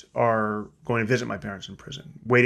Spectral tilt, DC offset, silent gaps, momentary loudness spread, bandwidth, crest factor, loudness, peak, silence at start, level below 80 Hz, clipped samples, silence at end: -6.5 dB/octave; under 0.1%; none; 15 LU; 12 kHz; 20 dB; -26 LUFS; -4 dBFS; 0.15 s; -58 dBFS; under 0.1%; 0 s